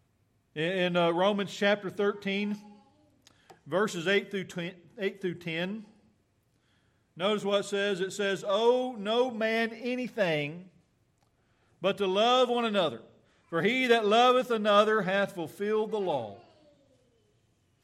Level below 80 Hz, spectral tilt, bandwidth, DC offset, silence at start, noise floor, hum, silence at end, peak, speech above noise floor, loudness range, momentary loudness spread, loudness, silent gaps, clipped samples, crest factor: -78 dBFS; -5 dB/octave; 14 kHz; under 0.1%; 0.55 s; -71 dBFS; none; 1.45 s; -10 dBFS; 43 dB; 7 LU; 12 LU; -28 LUFS; none; under 0.1%; 20 dB